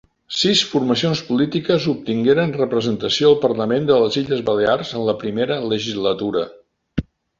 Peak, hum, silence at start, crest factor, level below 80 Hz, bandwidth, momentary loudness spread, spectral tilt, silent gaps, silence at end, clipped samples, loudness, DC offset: -2 dBFS; none; 0.3 s; 16 dB; -48 dBFS; 7.8 kHz; 8 LU; -5 dB/octave; none; 0.4 s; under 0.1%; -19 LUFS; under 0.1%